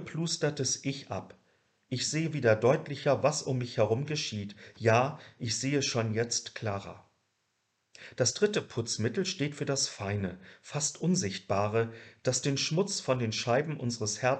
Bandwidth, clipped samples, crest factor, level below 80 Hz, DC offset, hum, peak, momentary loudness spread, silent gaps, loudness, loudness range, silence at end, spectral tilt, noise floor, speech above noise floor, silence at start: 11.5 kHz; under 0.1%; 20 dB; -68 dBFS; under 0.1%; none; -10 dBFS; 11 LU; none; -31 LUFS; 4 LU; 0 s; -4 dB/octave; -78 dBFS; 48 dB; 0 s